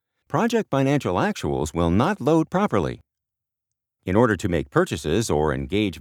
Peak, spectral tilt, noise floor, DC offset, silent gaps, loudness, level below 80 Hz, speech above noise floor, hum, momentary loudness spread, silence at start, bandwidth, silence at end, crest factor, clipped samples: -4 dBFS; -6 dB/octave; -86 dBFS; under 0.1%; none; -22 LUFS; -42 dBFS; 64 dB; none; 5 LU; 0.3 s; 17.5 kHz; 0 s; 20 dB; under 0.1%